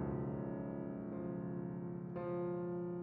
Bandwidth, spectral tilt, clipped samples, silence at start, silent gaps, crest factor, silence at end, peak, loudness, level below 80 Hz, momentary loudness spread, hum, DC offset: 3.8 kHz; -11 dB/octave; under 0.1%; 0 s; none; 12 dB; 0 s; -30 dBFS; -43 LUFS; -64 dBFS; 4 LU; none; under 0.1%